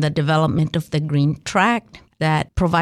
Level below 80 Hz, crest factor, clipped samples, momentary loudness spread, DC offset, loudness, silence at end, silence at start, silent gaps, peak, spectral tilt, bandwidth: -40 dBFS; 14 dB; under 0.1%; 5 LU; under 0.1%; -19 LUFS; 0 s; 0 s; none; -4 dBFS; -6.5 dB/octave; 12.5 kHz